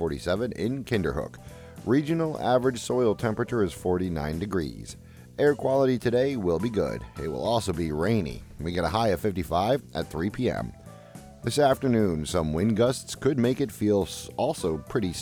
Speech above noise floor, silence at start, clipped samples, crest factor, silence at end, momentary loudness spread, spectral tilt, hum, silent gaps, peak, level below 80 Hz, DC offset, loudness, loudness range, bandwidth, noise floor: 20 dB; 0 s; under 0.1%; 16 dB; 0 s; 12 LU; -6 dB/octave; none; none; -10 dBFS; -46 dBFS; under 0.1%; -27 LUFS; 2 LU; 19.5 kHz; -46 dBFS